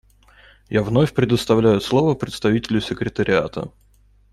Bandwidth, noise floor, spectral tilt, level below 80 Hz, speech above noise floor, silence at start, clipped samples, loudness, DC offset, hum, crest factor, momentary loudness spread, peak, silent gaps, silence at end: 14 kHz; -55 dBFS; -6.5 dB/octave; -46 dBFS; 36 dB; 0.7 s; under 0.1%; -19 LUFS; under 0.1%; none; 16 dB; 8 LU; -4 dBFS; none; 0.65 s